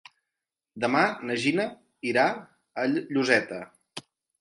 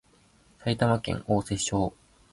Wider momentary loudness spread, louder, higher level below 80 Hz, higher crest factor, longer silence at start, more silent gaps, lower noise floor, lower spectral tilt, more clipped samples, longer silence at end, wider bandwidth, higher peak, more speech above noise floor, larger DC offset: first, 17 LU vs 7 LU; about the same, -26 LUFS vs -28 LUFS; second, -72 dBFS vs -50 dBFS; about the same, 22 dB vs 18 dB; first, 0.75 s vs 0.6 s; neither; first, -87 dBFS vs -61 dBFS; about the same, -4.5 dB/octave vs -5 dB/octave; neither; about the same, 0.4 s vs 0.4 s; about the same, 11.5 kHz vs 11.5 kHz; first, -6 dBFS vs -10 dBFS; first, 62 dB vs 34 dB; neither